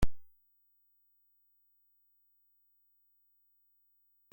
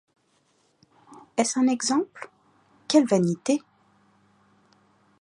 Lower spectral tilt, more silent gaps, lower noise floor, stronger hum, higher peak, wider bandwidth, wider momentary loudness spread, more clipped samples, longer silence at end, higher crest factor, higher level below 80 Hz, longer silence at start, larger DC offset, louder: first, -6.5 dB/octave vs -4.5 dB/octave; neither; first, -72 dBFS vs -67 dBFS; first, 50 Hz at -120 dBFS vs none; second, -16 dBFS vs -6 dBFS; first, 16.5 kHz vs 11 kHz; second, 0 LU vs 21 LU; neither; first, 4.1 s vs 1.65 s; about the same, 22 dB vs 22 dB; first, -48 dBFS vs -76 dBFS; second, 0 s vs 1.1 s; neither; second, -42 LUFS vs -24 LUFS